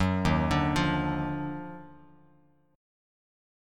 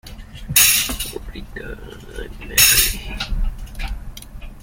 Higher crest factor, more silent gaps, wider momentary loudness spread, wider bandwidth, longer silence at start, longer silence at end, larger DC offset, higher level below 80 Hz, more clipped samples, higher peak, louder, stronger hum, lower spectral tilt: about the same, 18 dB vs 20 dB; neither; second, 15 LU vs 25 LU; second, 13 kHz vs 17 kHz; about the same, 0 s vs 0.05 s; first, 1.8 s vs 0 s; neither; second, -44 dBFS vs -30 dBFS; neither; second, -12 dBFS vs 0 dBFS; second, -28 LUFS vs -15 LUFS; neither; first, -6.5 dB/octave vs -0.5 dB/octave